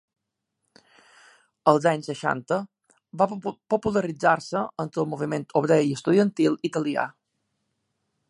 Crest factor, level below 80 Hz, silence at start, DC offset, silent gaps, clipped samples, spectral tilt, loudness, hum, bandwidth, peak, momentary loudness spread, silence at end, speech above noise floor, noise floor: 24 dB; -64 dBFS; 1.65 s; under 0.1%; none; under 0.1%; -6.5 dB/octave; -24 LUFS; none; 11.5 kHz; -2 dBFS; 8 LU; 1.2 s; 57 dB; -80 dBFS